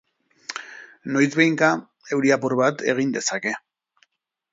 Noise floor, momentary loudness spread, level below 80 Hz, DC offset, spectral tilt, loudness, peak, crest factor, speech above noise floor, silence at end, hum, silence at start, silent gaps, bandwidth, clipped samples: -65 dBFS; 17 LU; -72 dBFS; under 0.1%; -4.5 dB/octave; -21 LUFS; -2 dBFS; 22 dB; 44 dB; 0.95 s; none; 0.5 s; none; 7.8 kHz; under 0.1%